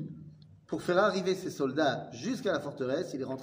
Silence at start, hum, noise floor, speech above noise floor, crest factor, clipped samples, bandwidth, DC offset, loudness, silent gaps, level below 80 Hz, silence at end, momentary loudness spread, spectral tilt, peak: 0 s; none; -52 dBFS; 21 dB; 18 dB; under 0.1%; 16 kHz; under 0.1%; -31 LUFS; none; -70 dBFS; 0 s; 10 LU; -5.5 dB/octave; -14 dBFS